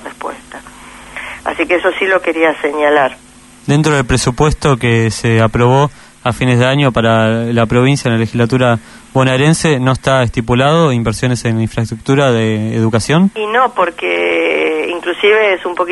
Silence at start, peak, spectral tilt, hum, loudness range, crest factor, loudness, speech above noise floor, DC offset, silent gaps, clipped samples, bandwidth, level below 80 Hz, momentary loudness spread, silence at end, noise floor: 0 s; 0 dBFS; -5.5 dB/octave; none; 1 LU; 12 dB; -13 LUFS; 23 dB; under 0.1%; none; under 0.1%; 12 kHz; -36 dBFS; 8 LU; 0 s; -34 dBFS